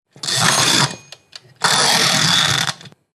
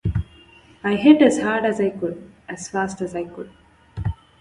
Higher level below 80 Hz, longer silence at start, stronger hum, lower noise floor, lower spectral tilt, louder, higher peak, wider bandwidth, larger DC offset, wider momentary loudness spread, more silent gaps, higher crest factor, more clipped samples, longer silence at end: second, -56 dBFS vs -40 dBFS; first, 0.25 s vs 0.05 s; neither; second, -41 dBFS vs -49 dBFS; second, -1.5 dB/octave vs -6 dB/octave; first, -14 LUFS vs -20 LUFS; about the same, 0 dBFS vs -2 dBFS; first, 14.5 kHz vs 11 kHz; neither; second, 8 LU vs 23 LU; neither; about the same, 16 dB vs 20 dB; neither; about the same, 0.25 s vs 0.25 s